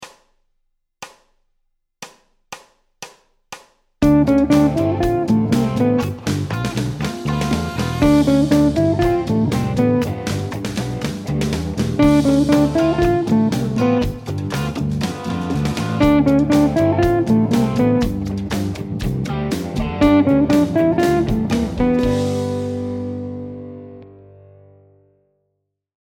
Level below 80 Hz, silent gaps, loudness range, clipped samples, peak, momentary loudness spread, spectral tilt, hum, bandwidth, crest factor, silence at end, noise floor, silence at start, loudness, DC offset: -34 dBFS; none; 5 LU; under 0.1%; -2 dBFS; 20 LU; -7 dB/octave; none; 17 kHz; 18 dB; 1.95 s; -74 dBFS; 0 s; -18 LUFS; under 0.1%